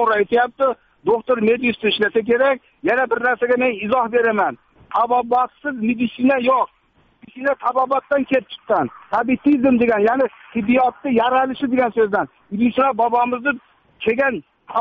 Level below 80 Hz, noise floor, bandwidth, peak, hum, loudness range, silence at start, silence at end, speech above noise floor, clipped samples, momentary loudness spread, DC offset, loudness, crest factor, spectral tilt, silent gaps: -56 dBFS; -51 dBFS; 5 kHz; -4 dBFS; none; 2 LU; 0 s; 0 s; 33 dB; under 0.1%; 7 LU; under 0.1%; -19 LUFS; 14 dB; -3 dB/octave; none